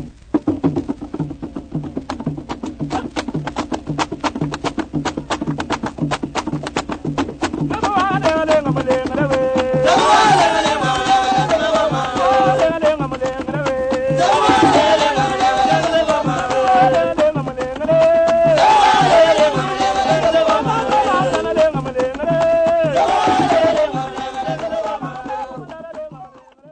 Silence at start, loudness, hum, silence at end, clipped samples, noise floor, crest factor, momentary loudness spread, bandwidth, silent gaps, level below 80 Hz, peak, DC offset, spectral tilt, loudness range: 0 s; -16 LUFS; none; 0.45 s; under 0.1%; -41 dBFS; 16 dB; 14 LU; 9.6 kHz; none; -42 dBFS; 0 dBFS; under 0.1%; -5 dB/octave; 10 LU